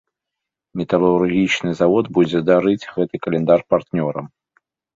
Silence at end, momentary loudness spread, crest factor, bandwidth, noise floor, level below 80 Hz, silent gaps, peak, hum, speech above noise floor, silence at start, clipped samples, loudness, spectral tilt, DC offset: 0.7 s; 8 LU; 16 dB; 7.6 kHz; -83 dBFS; -54 dBFS; none; -2 dBFS; none; 66 dB; 0.75 s; under 0.1%; -18 LUFS; -7 dB/octave; under 0.1%